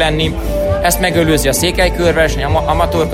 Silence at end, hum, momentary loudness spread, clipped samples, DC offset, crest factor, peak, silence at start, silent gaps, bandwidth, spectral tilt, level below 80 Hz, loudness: 0 s; none; 4 LU; under 0.1%; under 0.1%; 12 dB; 0 dBFS; 0 s; none; 16.5 kHz; -4.5 dB/octave; -22 dBFS; -13 LUFS